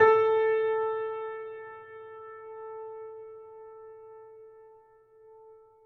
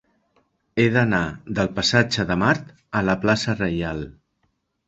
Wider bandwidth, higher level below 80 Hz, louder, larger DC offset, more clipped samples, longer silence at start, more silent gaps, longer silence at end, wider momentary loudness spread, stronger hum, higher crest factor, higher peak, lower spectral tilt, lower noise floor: second, 4.3 kHz vs 8.2 kHz; second, -80 dBFS vs -46 dBFS; second, -29 LUFS vs -21 LUFS; neither; neither; second, 0 s vs 0.75 s; neither; first, 1.35 s vs 0.75 s; first, 25 LU vs 10 LU; neither; about the same, 24 dB vs 22 dB; second, -8 dBFS vs -2 dBFS; about the same, -6 dB/octave vs -5.5 dB/octave; second, -58 dBFS vs -71 dBFS